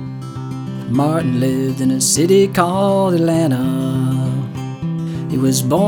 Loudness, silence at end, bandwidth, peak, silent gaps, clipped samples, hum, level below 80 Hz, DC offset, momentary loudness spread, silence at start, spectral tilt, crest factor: -16 LUFS; 0 s; 19 kHz; -2 dBFS; none; under 0.1%; none; -50 dBFS; under 0.1%; 13 LU; 0 s; -5.5 dB/octave; 14 dB